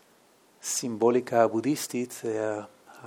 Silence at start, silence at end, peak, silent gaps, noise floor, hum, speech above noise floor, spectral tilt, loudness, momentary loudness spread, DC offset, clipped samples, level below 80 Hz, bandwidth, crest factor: 0.65 s; 0 s; -8 dBFS; none; -61 dBFS; none; 34 dB; -4 dB/octave; -27 LUFS; 12 LU; under 0.1%; under 0.1%; -82 dBFS; 18 kHz; 20 dB